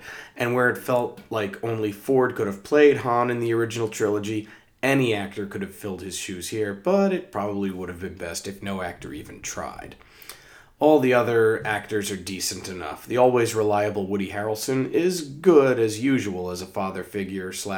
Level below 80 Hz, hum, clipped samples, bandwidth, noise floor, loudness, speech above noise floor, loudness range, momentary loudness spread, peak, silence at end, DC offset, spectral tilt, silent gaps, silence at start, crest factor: -60 dBFS; none; under 0.1%; over 20 kHz; -49 dBFS; -24 LUFS; 26 dB; 5 LU; 15 LU; -4 dBFS; 0 s; under 0.1%; -5 dB/octave; none; 0 s; 20 dB